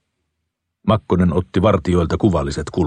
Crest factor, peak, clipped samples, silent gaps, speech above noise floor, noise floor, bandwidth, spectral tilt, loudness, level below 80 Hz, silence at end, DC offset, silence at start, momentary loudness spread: 16 dB; -2 dBFS; under 0.1%; none; 59 dB; -76 dBFS; 9.6 kHz; -7.5 dB/octave; -18 LUFS; -36 dBFS; 0 s; under 0.1%; 0.85 s; 5 LU